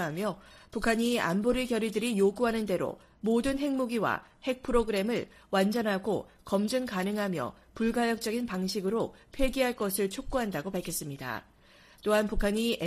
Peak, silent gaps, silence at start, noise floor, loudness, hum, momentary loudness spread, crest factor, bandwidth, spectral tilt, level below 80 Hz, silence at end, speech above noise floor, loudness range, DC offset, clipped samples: -12 dBFS; none; 0 s; -58 dBFS; -30 LUFS; none; 8 LU; 18 dB; 15.5 kHz; -5 dB/octave; -46 dBFS; 0 s; 28 dB; 3 LU; under 0.1%; under 0.1%